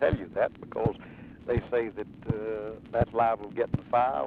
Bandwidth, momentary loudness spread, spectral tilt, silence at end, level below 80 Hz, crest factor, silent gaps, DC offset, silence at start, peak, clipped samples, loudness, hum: 5 kHz; 11 LU; -9.5 dB/octave; 0 s; -46 dBFS; 20 dB; none; under 0.1%; 0 s; -10 dBFS; under 0.1%; -30 LUFS; none